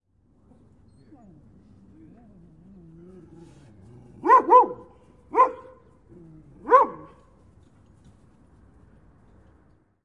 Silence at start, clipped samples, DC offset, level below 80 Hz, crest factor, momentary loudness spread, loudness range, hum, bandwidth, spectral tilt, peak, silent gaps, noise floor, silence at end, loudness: 4.25 s; under 0.1%; under 0.1%; -62 dBFS; 24 dB; 27 LU; 6 LU; none; 7 kHz; -7 dB/octave; -4 dBFS; none; -61 dBFS; 3.1 s; -20 LUFS